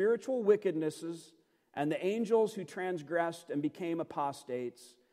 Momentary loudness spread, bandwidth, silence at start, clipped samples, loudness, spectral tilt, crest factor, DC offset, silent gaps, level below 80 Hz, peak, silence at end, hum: 12 LU; 14.5 kHz; 0 s; under 0.1%; -34 LUFS; -6 dB/octave; 20 dB; under 0.1%; none; -86 dBFS; -14 dBFS; 0.25 s; none